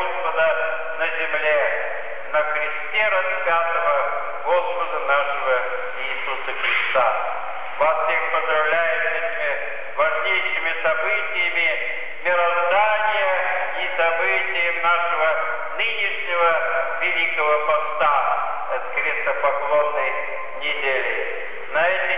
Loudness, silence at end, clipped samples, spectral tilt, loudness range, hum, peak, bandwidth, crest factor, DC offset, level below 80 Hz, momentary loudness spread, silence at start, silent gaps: -21 LUFS; 0 s; under 0.1%; -5 dB/octave; 2 LU; none; -8 dBFS; 4 kHz; 14 dB; 4%; -70 dBFS; 7 LU; 0 s; none